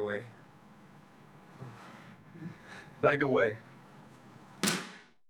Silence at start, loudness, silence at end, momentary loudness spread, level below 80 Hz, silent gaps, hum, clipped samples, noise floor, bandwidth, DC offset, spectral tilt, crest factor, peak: 0 s; -31 LUFS; 0.3 s; 26 LU; -74 dBFS; none; none; under 0.1%; -56 dBFS; 19 kHz; under 0.1%; -4 dB/octave; 24 dB; -12 dBFS